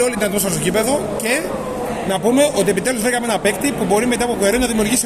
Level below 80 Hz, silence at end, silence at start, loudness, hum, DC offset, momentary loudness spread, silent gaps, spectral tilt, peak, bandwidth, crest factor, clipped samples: -40 dBFS; 0 s; 0 s; -17 LUFS; none; under 0.1%; 5 LU; none; -3.5 dB/octave; -2 dBFS; 15 kHz; 14 dB; under 0.1%